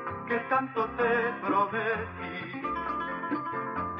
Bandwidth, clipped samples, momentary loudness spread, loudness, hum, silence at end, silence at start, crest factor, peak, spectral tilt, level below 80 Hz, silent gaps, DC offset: 5.8 kHz; under 0.1%; 8 LU; -30 LUFS; none; 0 s; 0 s; 16 dB; -14 dBFS; -8.5 dB/octave; -58 dBFS; none; under 0.1%